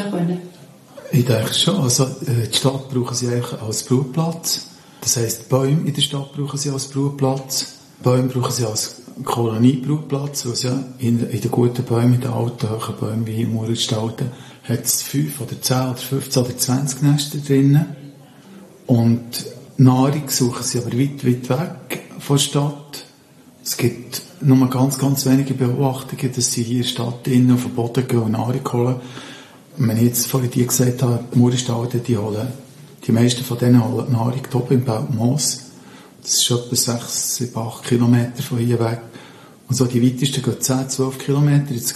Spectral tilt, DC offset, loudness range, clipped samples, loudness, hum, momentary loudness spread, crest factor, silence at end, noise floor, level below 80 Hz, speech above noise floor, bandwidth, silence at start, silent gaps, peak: -5 dB/octave; under 0.1%; 2 LU; under 0.1%; -19 LUFS; none; 10 LU; 18 dB; 0 s; -47 dBFS; -58 dBFS; 29 dB; 13 kHz; 0 s; none; -2 dBFS